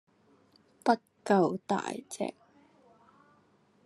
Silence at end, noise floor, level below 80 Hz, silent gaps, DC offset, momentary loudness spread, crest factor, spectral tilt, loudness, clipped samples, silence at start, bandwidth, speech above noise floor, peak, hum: 1.55 s; -66 dBFS; -82 dBFS; none; under 0.1%; 11 LU; 24 dB; -5.5 dB/octave; -31 LUFS; under 0.1%; 0.85 s; 12.5 kHz; 36 dB; -10 dBFS; none